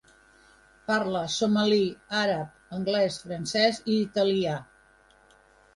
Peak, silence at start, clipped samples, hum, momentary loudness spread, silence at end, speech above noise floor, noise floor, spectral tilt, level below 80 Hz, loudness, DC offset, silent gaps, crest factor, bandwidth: -10 dBFS; 0.9 s; under 0.1%; none; 9 LU; 1.15 s; 33 dB; -59 dBFS; -4.5 dB/octave; -64 dBFS; -26 LUFS; under 0.1%; none; 18 dB; 11.5 kHz